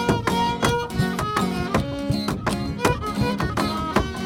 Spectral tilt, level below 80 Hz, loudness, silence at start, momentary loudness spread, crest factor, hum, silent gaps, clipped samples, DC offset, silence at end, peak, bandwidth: -5.5 dB/octave; -38 dBFS; -23 LUFS; 0 s; 4 LU; 20 dB; none; none; under 0.1%; under 0.1%; 0 s; -4 dBFS; 19 kHz